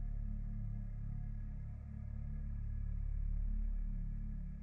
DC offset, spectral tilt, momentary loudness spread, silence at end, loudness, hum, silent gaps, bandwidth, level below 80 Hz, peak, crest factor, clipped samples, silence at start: under 0.1%; -11 dB/octave; 5 LU; 0 s; -45 LUFS; none; none; 2.4 kHz; -40 dBFS; -32 dBFS; 8 dB; under 0.1%; 0 s